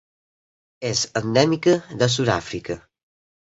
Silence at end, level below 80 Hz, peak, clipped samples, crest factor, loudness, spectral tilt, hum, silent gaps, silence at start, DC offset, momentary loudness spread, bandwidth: 0.8 s; -54 dBFS; -2 dBFS; under 0.1%; 22 dB; -21 LUFS; -4.5 dB/octave; none; none; 0.8 s; under 0.1%; 13 LU; 8.2 kHz